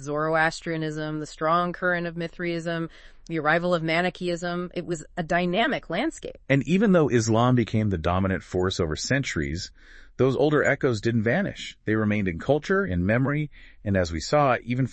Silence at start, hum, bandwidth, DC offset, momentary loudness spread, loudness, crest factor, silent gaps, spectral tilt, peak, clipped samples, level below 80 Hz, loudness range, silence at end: 0 s; none; 8.8 kHz; under 0.1%; 10 LU; -25 LUFS; 18 dB; none; -6 dB/octave; -6 dBFS; under 0.1%; -48 dBFS; 3 LU; 0 s